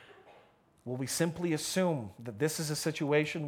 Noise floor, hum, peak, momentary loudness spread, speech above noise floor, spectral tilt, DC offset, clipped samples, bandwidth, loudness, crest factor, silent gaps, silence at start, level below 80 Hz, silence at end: -63 dBFS; none; -14 dBFS; 11 LU; 31 dB; -4.5 dB/octave; under 0.1%; under 0.1%; 19.5 kHz; -33 LUFS; 20 dB; none; 0 s; -70 dBFS; 0 s